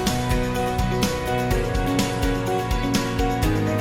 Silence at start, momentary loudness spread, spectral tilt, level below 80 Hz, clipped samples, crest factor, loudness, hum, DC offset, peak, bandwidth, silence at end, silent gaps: 0 s; 2 LU; -5.5 dB/octave; -30 dBFS; under 0.1%; 12 dB; -23 LUFS; none; under 0.1%; -10 dBFS; 17 kHz; 0 s; none